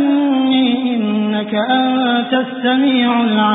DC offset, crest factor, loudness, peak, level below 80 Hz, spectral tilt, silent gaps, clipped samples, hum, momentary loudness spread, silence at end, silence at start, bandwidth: under 0.1%; 12 dB; -15 LUFS; -2 dBFS; -64 dBFS; -10.5 dB/octave; none; under 0.1%; none; 4 LU; 0 s; 0 s; 4 kHz